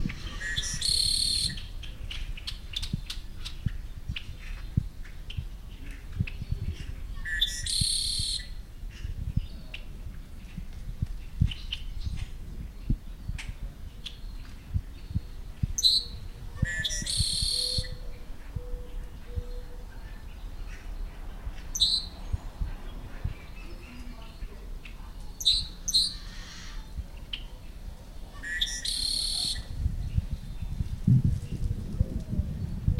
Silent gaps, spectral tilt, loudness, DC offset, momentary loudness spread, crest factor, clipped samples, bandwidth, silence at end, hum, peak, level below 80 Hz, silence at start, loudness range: none; -2.5 dB/octave; -30 LUFS; under 0.1%; 21 LU; 22 dB; under 0.1%; 16 kHz; 0 s; none; -10 dBFS; -36 dBFS; 0 s; 10 LU